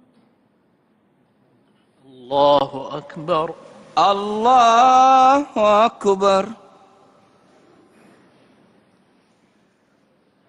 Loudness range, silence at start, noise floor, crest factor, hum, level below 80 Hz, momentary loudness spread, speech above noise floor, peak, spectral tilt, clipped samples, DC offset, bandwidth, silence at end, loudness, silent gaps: 9 LU; 2.3 s; -61 dBFS; 16 dB; none; -60 dBFS; 18 LU; 45 dB; -4 dBFS; -4.5 dB/octave; under 0.1%; under 0.1%; 10 kHz; 3.95 s; -16 LUFS; none